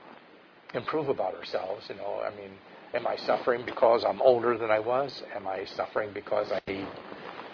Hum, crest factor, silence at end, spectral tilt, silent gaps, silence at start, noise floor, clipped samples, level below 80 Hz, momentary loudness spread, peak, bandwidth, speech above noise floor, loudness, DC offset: none; 22 dB; 0 s; -6.5 dB/octave; none; 0 s; -55 dBFS; under 0.1%; -68 dBFS; 15 LU; -8 dBFS; 5.4 kHz; 26 dB; -29 LUFS; under 0.1%